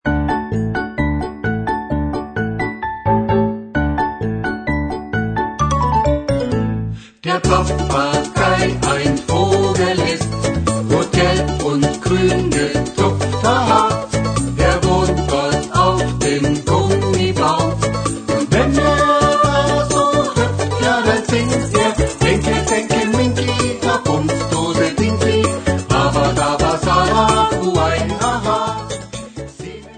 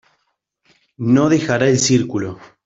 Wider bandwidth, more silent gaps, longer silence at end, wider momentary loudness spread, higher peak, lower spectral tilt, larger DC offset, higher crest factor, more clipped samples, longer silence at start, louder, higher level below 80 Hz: first, 9.4 kHz vs 8 kHz; neither; second, 0 s vs 0.2 s; second, 7 LU vs 11 LU; about the same, 0 dBFS vs -2 dBFS; about the same, -5 dB/octave vs -5 dB/octave; neither; about the same, 16 dB vs 16 dB; neither; second, 0.05 s vs 1 s; about the same, -16 LUFS vs -16 LUFS; first, -30 dBFS vs -54 dBFS